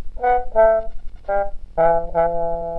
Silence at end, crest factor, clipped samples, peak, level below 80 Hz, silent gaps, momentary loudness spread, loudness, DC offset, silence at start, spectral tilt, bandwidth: 0 s; 14 dB; under 0.1%; -4 dBFS; -32 dBFS; none; 10 LU; -19 LUFS; 3%; 0 s; -8.5 dB/octave; 3.9 kHz